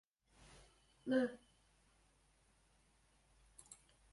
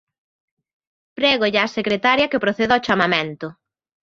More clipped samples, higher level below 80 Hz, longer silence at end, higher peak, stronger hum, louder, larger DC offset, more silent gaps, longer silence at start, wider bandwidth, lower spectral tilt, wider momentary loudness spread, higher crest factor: neither; second, -74 dBFS vs -58 dBFS; second, 0.4 s vs 0.55 s; second, -24 dBFS vs -2 dBFS; neither; second, -40 LUFS vs -18 LUFS; neither; neither; about the same, 1.05 s vs 1.15 s; first, 11.5 kHz vs 7.6 kHz; about the same, -5 dB/octave vs -5 dB/octave; first, 26 LU vs 8 LU; about the same, 24 dB vs 20 dB